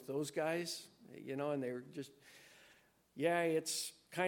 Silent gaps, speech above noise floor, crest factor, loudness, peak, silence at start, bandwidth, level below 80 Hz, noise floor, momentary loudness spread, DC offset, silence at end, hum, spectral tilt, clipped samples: none; 30 dB; 20 dB; -40 LUFS; -20 dBFS; 0 s; 17.5 kHz; -88 dBFS; -69 dBFS; 22 LU; under 0.1%; 0 s; none; -4 dB/octave; under 0.1%